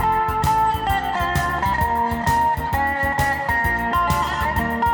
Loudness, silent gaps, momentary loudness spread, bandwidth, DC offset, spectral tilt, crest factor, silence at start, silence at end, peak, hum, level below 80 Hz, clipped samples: -20 LUFS; none; 2 LU; over 20 kHz; under 0.1%; -5 dB/octave; 14 dB; 0 s; 0 s; -6 dBFS; none; -32 dBFS; under 0.1%